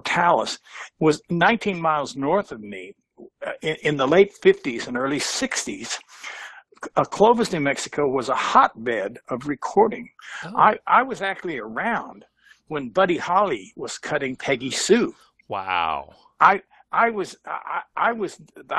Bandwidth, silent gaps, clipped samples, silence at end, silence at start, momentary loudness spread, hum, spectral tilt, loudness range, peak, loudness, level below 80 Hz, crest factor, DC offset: 12.5 kHz; none; under 0.1%; 0 s; 0.05 s; 15 LU; none; -4 dB/octave; 3 LU; 0 dBFS; -22 LUFS; -60 dBFS; 22 dB; under 0.1%